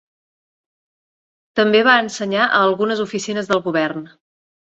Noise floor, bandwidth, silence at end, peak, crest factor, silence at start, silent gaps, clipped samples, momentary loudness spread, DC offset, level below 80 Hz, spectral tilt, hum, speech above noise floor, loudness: under -90 dBFS; 8.2 kHz; 0.65 s; -2 dBFS; 18 dB; 1.55 s; none; under 0.1%; 10 LU; under 0.1%; -64 dBFS; -4 dB/octave; none; over 73 dB; -17 LUFS